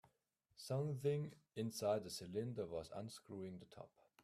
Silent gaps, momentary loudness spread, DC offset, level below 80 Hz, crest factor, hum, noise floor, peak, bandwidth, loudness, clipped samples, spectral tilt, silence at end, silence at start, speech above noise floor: none; 16 LU; under 0.1%; -78 dBFS; 18 dB; none; -83 dBFS; -28 dBFS; 15 kHz; -45 LUFS; under 0.1%; -6 dB/octave; 0.35 s; 0.6 s; 38 dB